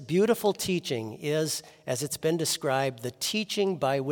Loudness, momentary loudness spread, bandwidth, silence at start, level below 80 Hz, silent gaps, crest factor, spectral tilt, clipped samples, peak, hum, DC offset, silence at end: -28 LUFS; 7 LU; 18 kHz; 0 s; -68 dBFS; none; 16 dB; -4 dB/octave; under 0.1%; -12 dBFS; none; under 0.1%; 0 s